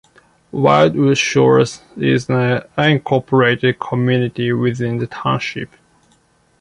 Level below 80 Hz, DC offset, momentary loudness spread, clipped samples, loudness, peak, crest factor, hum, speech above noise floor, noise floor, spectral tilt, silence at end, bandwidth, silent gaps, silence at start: -52 dBFS; under 0.1%; 9 LU; under 0.1%; -16 LUFS; 0 dBFS; 16 dB; none; 41 dB; -56 dBFS; -6 dB/octave; 0.95 s; 11 kHz; none; 0.55 s